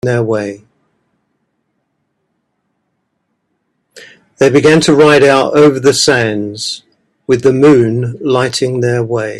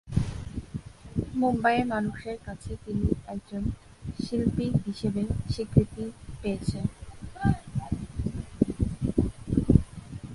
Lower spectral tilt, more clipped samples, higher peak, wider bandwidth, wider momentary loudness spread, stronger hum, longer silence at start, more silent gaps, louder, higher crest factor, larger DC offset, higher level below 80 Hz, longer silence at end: second, -5 dB/octave vs -8 dB/octave; neither; about the same, 0 dBFS vs -2 dBFS; first, 13 kHz vs 11.5 kHz; about the same, 13 LU vs 14 LU; neither; about the same, 0.05 s vs 0.05 s; neither; first, -10 LUFS vs -29 LUFS; second, 12 dB vs 26 dB; neither; second, -50 dBFS vs -38 dBFS; about the same, 0 s vs 0 s